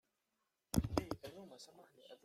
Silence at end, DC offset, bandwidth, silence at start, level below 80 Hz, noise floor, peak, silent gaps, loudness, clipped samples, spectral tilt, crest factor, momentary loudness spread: 0.1 s; under 0.1%; 16 kHz; 0.75 s; -56 dBFS; -87 dBFS; -18 dBFS; none; -41 LUFS; under 0.1%; -5.5 dB/octave; 26 dB; 22 LU